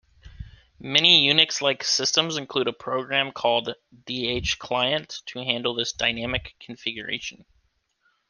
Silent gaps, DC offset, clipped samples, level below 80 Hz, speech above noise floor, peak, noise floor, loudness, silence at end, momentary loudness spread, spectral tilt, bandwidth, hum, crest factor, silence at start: none; under 0.1%; under 0.1%; -52 dBFS; 44 dB; 0 dBFS; -69 dBFS; -22 LUFS; 0.95 s; 16 LU; -2 dB/octave; 11 kHz; none; 24 dB; 0.25 s